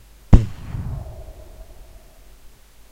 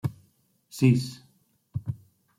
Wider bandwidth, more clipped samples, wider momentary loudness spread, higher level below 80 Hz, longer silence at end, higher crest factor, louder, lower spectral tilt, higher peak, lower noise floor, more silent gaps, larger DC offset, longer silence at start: second, 14 kHz vs 15.5 kHz; first, 0.2% vs under 0.1%; first, 26 LU vs 20 LU; first, -26 dBFS vs -60 dBFS; first, 1.3 s vs 0.45 s; about the same, 22 dB vs 20 dB; first, -21 LUFS vs -27 LUFS; first, -8.5 dB/octave vs -7 dB/octave; first, 0 dBFS vs -8 dBFS; second, -45 dBFS vs -66 dBFS; neither; neither; first, 0.3 s vs 0.05 s